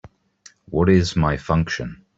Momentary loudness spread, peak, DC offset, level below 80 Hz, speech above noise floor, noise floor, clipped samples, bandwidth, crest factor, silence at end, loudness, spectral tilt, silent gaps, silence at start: 10 LU; -4 dBFS; under 0.1%; -40 dBFS; 33 dB; -52 dBFS; under 0.1%; 7.8 kHz; 18 dB; 0.25 s; -20 LUFS; -6.5 dB/octave; none; 0.7 s